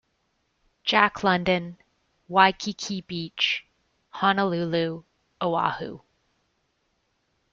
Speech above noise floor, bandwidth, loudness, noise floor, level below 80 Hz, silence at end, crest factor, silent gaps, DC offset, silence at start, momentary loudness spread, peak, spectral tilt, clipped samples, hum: 48 dB; 7.6 kHz; -24 LUFS; -73 dBFS; -62 dBFS; 1.55 s; 24 dB; none; under 0.1%; 0.85 s; 14 LU; -2 dBFS; -4.5 dB/octave; under 0.1%; none